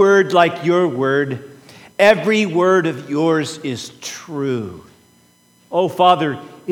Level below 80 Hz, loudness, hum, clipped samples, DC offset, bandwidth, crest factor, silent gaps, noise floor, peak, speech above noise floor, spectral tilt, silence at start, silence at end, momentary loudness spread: -64 dBFS; -17 LUFS; none; under 0.1%; under 0.1%; 17.5 kHz; 18 dB; none; -54 dBFS; 0 dBFS; 37 dB; -5.5 dB/octave; 0 s; 0 s; 15 LU